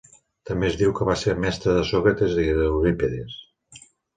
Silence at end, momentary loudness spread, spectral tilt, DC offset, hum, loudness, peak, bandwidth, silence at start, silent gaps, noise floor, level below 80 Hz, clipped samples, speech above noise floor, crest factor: 0.4 s; 10 LU; -6.5 dB/octave; under 0.1%; none; -22 LUFS; -6 dBFS; 9.4 kHz; 0.45 s; none; -50 dBFS; -38 dBFS; under 0.1%; 29 dB; 18 dB